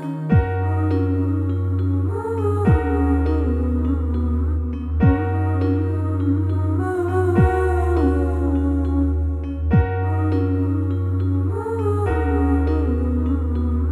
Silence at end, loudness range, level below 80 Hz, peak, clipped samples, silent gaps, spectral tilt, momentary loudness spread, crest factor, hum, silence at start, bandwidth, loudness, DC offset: 0 s; 1 LU; -26 dBFS; -4 dBFS; under 0.1%; none; -10 dB/octave; 4 LU; 14 dB; none; 0 s; 4.3 kHz; -20 LUFS; under 0.1%